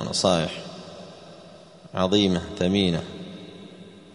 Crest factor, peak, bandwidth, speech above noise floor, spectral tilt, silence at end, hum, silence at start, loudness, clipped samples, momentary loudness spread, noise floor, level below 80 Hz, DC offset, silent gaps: 20 dB; -6 dBFS; 10.5 kHz; 24 dB; -5 dB/octave; 0.05 s; none; 0 s; -23 LUFS; under 0.1%; 23 LU; -47 dBFS; -54 dBFS; under 0.1%; none